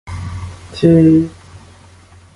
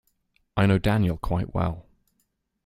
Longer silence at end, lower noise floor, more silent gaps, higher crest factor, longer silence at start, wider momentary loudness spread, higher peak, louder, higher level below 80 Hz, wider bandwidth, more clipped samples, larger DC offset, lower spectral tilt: about the same, 0.8 s vs 0.85 s; second, -43 dBFS vs -74 dBFS; neither; about the same, 16 dB vs 20 dB; second, 0.05 s vs 0.55 s; first, 20 LU vs 10 LU; first, 0 dBFS vs -6 dBFS; first, -12 LUFS vs -25 LUFS; about the same, -36 dBFS vs -40 dBFS; second, 11 kHz vs 15 kHz; neither; neither; about the same, -8.5 dB/octave vs -8 dB/octave